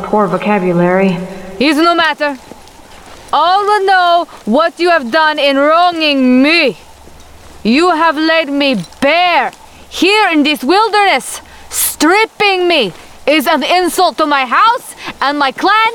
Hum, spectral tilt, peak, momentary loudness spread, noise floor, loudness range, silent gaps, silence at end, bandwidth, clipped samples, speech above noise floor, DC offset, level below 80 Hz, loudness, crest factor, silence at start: none; -3.5 dB/octave; 0 dBFS; 8 LU; -36 dBFS; 2 LU; none; 0 s; 19 kHz; under 0.1%; 25 dB; 0.3%; -46 dBFS; -11 LUFS; 12 dB; 0 s